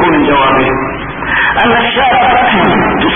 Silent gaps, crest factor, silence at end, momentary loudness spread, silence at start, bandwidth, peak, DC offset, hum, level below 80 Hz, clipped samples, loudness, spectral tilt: none; 10 dB; 0 s; 6 LU; 0 s; 3.7 kHz; 0 dBFS; under 0.1%; none; -30 dBFS; under 0.1%; -9 LUFS; -8.5 dB/octave